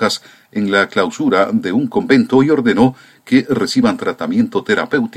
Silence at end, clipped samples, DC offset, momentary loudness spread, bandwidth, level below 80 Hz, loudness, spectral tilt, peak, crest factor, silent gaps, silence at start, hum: 0 s; under 0.1%; under 0.1%; 6 LU; 13.5 kHz; -56 dBFS; -15 LUFS; -5.5 dB/octave; 0 dBFS; 14 dB; none; 0 s; none